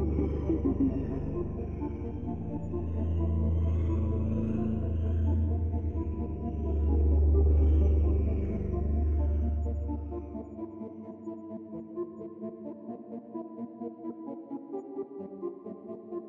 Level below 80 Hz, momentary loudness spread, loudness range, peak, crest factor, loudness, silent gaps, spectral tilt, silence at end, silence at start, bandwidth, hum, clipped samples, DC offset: -34 dBFS; 16 LU; 13 LU; -16 dBFS; 14 dB; -32 LUFS; none; -12 dB/octave; 0 s; 0 s; 3 kHz; none; under 0.1%; under 0.1%